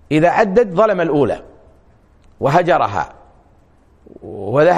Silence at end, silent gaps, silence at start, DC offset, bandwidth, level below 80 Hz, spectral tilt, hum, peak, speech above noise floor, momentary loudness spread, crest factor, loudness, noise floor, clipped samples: 0 s; none; 0.1 s; under 0.1%; 10.5 kHz; -48 dBFS; -7 dB/octave; none; 0 dBFS; 36 dB; 15 LU; 16 dB; -15 LUFS; -51 dBFS; under 0.1%